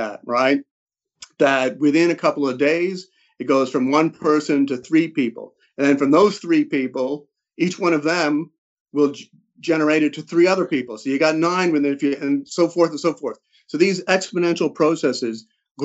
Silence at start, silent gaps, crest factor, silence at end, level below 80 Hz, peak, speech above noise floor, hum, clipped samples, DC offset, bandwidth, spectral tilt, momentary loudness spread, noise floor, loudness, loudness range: 0 s; 0.71-0.86 s, 8.58-8.86 s, 15.71-15.75 s; 16 dB; 0 s; -72 dBFS; -4 dBFS; 28 dB; none; under 0.1%; under 0.1%; 8.2 kHz; -5.5 dB/octave; 9 LU; -47 dBFS; -19 LUFS; 2 LU